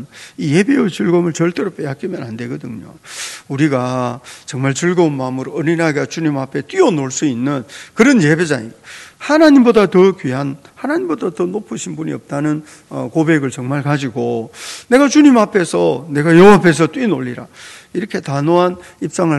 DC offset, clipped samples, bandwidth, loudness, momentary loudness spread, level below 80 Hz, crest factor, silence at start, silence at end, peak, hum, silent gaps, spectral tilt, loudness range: under 0.1%; 0.4%; 12.5 kHz; -14 LUFS; 17 LU; -54 dBFS; 14 dB; 0 s; 0 s; 0 dBFS; none; none; -6 dB/octave; 8 LU